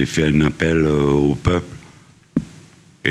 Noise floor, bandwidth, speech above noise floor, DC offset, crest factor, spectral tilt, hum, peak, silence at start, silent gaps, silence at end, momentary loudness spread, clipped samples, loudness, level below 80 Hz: -47 dBFS; 12 kHz; 31 dB; under 0.1%; 16 dB; -6.5 dB/octave; none; -2 dBFS; 0 s; none; 0 s; 10 LU; under 0.1%; -18 LUFS; -34 dBFS